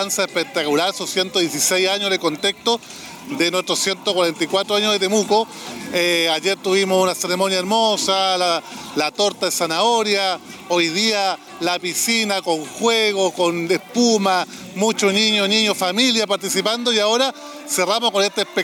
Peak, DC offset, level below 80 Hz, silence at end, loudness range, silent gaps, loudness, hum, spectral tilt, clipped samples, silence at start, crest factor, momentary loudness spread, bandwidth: -6 dBFS; under 0.1%; -66 dBFS; 0 s; 2 LU; none; -18 LUFS; none; -2.5 dB/octave; under 0.1%; 0 s; 14 dB; 6 LU; 19.5 kHz